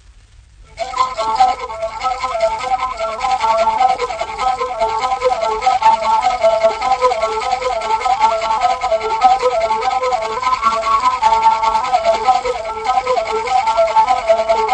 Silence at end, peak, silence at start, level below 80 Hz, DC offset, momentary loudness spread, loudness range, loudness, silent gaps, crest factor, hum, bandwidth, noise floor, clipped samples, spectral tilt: 0 s; 0 dBFS; 0.1 s; -42 dBFS; under 0.1%; 6 LU; 3 LU; -16 LUFS; none; 16 dB; none; 9.6 kHz; -44 dBFS; under 0.1%; -2 dB/octave